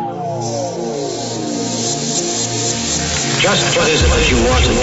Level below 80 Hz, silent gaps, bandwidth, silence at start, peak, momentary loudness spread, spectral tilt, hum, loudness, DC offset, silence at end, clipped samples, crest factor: -24 dBFS; none; 8.2 kHz; 0 s; -2 dBFS; 9 LU; -3 dB/octave; none; -15 LUFS; under 0.1%; 0 s; under 0.1%; 14 dB